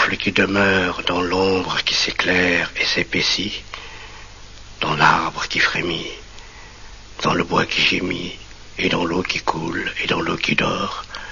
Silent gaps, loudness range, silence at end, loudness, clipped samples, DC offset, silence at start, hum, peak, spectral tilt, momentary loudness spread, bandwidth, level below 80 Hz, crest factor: none; 4 LU; 0 s; -19 LUFS; under 0.1%; under 0.1%; 0 s; none; -2 dBFS; -2 dB/octave; 18 LU; 7.4 kHz; -44 dBFS; 18 dB